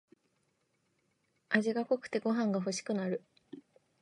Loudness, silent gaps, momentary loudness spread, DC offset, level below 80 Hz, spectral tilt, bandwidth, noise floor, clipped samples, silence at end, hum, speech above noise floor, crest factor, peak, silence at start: -34 LUFS; none; 23 LU; under 0.1%; -86 dBFS; -5 dB/octave; 11 kHz; -77 dBFS; under 0.1%; 0.4 s; none; 45 dB; 24 dB; -12 dBFS; 1.5 s